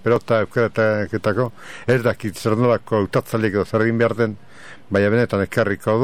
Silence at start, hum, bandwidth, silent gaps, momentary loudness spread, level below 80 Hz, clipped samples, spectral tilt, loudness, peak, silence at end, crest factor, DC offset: 0.05 s; none; 16 kHz; none; 6 LU; -54 dBFS; under 0.1%; -7 dB/octave; -20 LUFS; -4 dBFS; 0 s; 16 dB; 0.9%